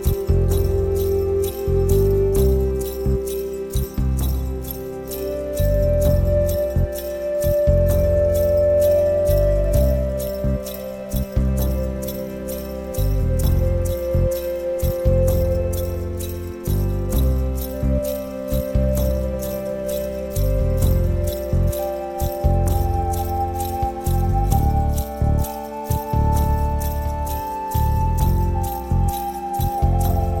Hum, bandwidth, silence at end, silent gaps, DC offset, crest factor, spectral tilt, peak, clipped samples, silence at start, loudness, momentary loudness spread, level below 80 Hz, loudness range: none; 17.5 kHz; 0 s; none; under 0.1%; 16 dB; -7.5 dB/octave; -4 dBFS; under 0.1%; 0 s; -21 LUFS; 8 LU; -24 dBFS; 5 LU